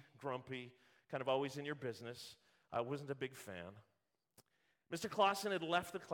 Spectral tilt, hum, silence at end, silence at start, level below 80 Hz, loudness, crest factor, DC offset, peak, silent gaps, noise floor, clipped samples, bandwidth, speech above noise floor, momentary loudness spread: -4.5 dB/octave; none; 0 s; 0.2 s; -82 dBFS; -42 LUFS; 24 dB; under 0.1%; -20 dBFS; none; -85 dBFS; under 0.1%; 17.5 kHz; 43 dB; 16 LU